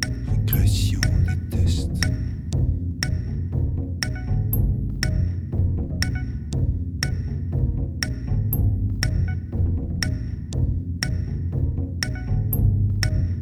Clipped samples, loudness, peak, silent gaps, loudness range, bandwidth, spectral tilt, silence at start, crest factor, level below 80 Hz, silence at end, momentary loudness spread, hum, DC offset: under 0.1%; -24 LUFS; -4 dBFS; none; 2 LU; 16.5 kHz; -5.5 dB/octave; 0 s; 18 dB; -28 dBFS; 0 s; 6 LU; none; under 0.1%